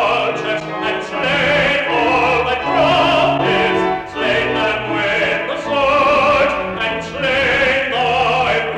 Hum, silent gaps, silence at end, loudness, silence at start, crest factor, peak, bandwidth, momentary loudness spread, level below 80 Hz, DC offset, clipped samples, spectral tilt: none; none; 0 s; -15 LUFS; 0 s; 12 dB; -4 dBFS; 11.5 kHz; 7 LU; -42 dBFS; under 0.1%; under 0.1%; -4.5 dB/octave